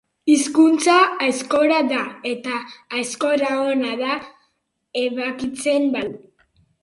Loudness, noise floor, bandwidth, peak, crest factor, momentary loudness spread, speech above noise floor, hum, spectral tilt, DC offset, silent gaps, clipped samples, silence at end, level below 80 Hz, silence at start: -20 LUFS; -70 dBFS; 11.5 kHz; -2 dBFS; 18 dB; 12 LU; 51 dB; none; -2.5 dB/octave; under 0.1%; none; under 0.1%; 0.65 s; -64 dBFS; 0.25 s